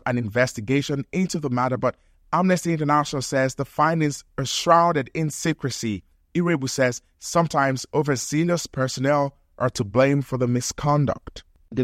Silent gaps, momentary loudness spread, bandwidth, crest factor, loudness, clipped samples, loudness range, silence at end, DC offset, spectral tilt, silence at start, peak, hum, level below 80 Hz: none; 7 LU; 16 kHz; 20 dB; -23 LUFS; under 0.1%; 2 LU; 0 s; under 0.1%; -5 dB/octave; 0.05 s; -2 dBFS; none; -52 dBFS